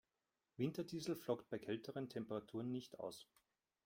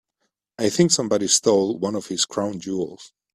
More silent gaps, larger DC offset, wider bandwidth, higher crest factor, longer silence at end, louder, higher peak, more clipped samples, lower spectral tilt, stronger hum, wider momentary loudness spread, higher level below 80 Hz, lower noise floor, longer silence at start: neither; neither; about the same, 16.5 kHz vs 15 kHz; about the same, 20 dB vs 22 dB; first, 0.6 s vs 0.25 s; second, -47 LUFS vs -21 LUFS; second, -28 dBFS vs -2 dBFS; neither; first, -6 dB/octave vs -3.5 dB/octave; neither; second, 8 LU vs 11 LU; second, -82 dBFS vs -62 dBFS; first, under -90 dBFS vs -76 dBFS; about the same, 0.6 s vs 0.6 s